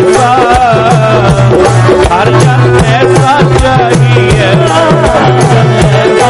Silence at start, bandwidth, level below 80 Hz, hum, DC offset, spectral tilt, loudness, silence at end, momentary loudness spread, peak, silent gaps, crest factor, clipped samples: 0 s; 11.5 kHz; -22 dBFS; none; under 0.1%; -6 dB/octave; -6 LUFS; 0 s; 1 LU; 0 dBFS; none; 6 dB; 0.6%